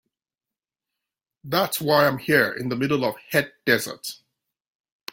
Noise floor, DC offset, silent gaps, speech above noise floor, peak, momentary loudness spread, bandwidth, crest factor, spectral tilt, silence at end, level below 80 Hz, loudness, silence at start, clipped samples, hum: under -90 dBFS; under 0.1%; none; over 67 dB; -4 dBFS; 12 LU; 17 kHz; 22 dB; -4.5 dB/octave; 1 s; -64 dBFS; -22 LUFS; 1.45 s; under 0.1%; none